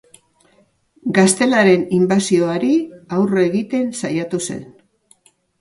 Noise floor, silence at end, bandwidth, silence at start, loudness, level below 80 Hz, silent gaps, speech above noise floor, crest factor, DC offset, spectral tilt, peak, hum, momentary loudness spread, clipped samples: -57 dBFS; 0.95 s; 11.5 kHz; 1.05 s; -17 LUFS; -60 dBFS; none; 41 dB; 18 dB; under 0.1%; -5 dB/octave; 0 dBFS; none; 10 LU; under 0.1%